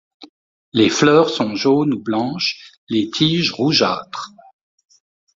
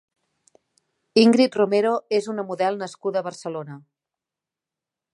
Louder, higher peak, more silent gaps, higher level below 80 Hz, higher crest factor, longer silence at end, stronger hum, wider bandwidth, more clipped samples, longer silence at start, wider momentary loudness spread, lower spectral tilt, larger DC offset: first, -17 LUFS vs -22 LUFS; about the same, -2 dBFS vs -4 dBFS; first, 0.29-0.72 s, 2.78-2.87 s vs none; first, -58 dBFS vs -74 dBFS; about the same, 18 dB vs 20 dB; second, 1.1 s vs 1.35 s; neither; second, 7.8 kHz vs 11.5 kHz; neither; second, 0.2 s vs 1.15 s; second, 13 LU vs 16 LU; about the same, -4.5 dB/octave vs -5.5 dB/octave; neither